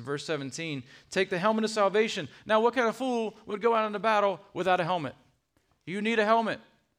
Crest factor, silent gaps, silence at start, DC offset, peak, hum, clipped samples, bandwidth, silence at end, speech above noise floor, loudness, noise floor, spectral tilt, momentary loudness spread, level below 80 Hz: 18 dB; none; 0 s; under 0.1%; -10 dBFS; none; under 0.1%; 15 kHz; 0.4 s; 44 dB; -28 LUFS; -72 dBFS; -4.5 dB/octave; 11 LU; -74 dBFS